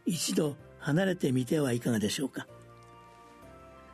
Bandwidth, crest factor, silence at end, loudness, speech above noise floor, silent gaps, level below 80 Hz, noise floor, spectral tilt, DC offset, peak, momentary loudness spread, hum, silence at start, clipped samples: 13.5 kHz; 16 dB; 0 s; -30 LUFS; 24 dB; none; -64 dBFS; -53 dBFS; -5 dB/octave; under 0.1%; -16 dBFS; 20 LU; none; 0.05 s; under 0.1%